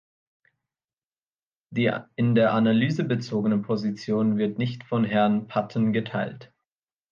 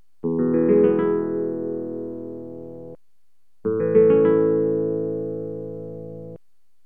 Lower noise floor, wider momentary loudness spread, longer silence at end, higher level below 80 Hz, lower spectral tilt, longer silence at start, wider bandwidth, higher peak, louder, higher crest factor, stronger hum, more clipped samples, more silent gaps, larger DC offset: first, under -90 dBFS vs -77 dBFS; second, 8 LU vs 20 LU; first, 0.65 s vs 0.5 s; about the same, -68 dBFS vs -66 dBFS; second, -8 dB/octave vs -11.5 dB/octave; first, 1.7 s vs 0.25 s; first, 7 kHz vs 3.2 kHz; about the same, -8 dBFS vs -6 dBFS; second, -25 LUFS vs -21 LUFS; about the same, 16 dB vs 16 dB; neither; neither; neither; second, under 0.1% vs 0.5%